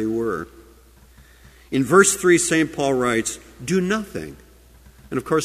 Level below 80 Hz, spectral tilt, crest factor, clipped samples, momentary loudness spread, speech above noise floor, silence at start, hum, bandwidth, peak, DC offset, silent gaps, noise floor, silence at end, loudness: -50 dBFS; -4 dB/octave; 22 dB; under 0.1%; 18 LU; 30 dB; 0 s; none; 15.5 kHz; 0 dBFS; under 0.1%; none; -50 dBFS; 0 s; -20 LUFS